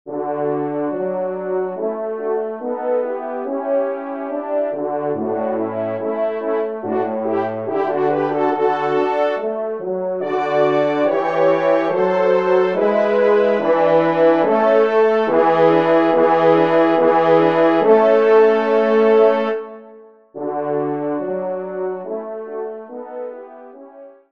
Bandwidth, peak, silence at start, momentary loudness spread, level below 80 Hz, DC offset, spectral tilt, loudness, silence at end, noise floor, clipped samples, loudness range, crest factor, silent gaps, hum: 6.4 kHz; 0 dBFS; 0.05 s; 11 LU; -70 dBFS; 0.2%; -7.5 dB/octave; -17 LUFS; 0.2 s; -43 dBFS; under 0.1%; 9 LU; 16 dB; none; none